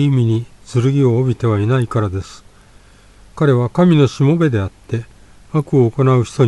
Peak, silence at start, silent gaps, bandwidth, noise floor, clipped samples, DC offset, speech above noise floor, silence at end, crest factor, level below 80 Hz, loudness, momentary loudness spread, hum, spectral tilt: 0 dBFS; 0 s; none; 11 kHz; -45 dBFS; under 0.1%; under 0.1%; 31 dB; 0 s; 14 dB; -46 dBFS; -16 LUFS; 10 LU; 50 Hz at -45 dBFS; -8 dB/octave